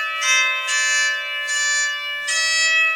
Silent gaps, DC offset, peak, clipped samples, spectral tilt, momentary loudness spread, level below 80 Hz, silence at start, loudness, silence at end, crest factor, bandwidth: none; under 0.1%; -6 dBFS; under 0.1%; 5 dB/octave; 6 LU; -66 dBFS; 0 s; -17 LUFS; 0 s; 14 dB; 17 kHz